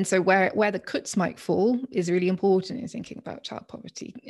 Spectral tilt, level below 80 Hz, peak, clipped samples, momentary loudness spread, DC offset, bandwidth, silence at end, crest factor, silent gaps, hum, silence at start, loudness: -5.5 dB/octave; -66 dBFS; -8 dBFS; under 0.1%; 17 LU; under 0.1%; 12.5 kHz; 0 s; 18 dB; none; none; 0 s; -24 LUFS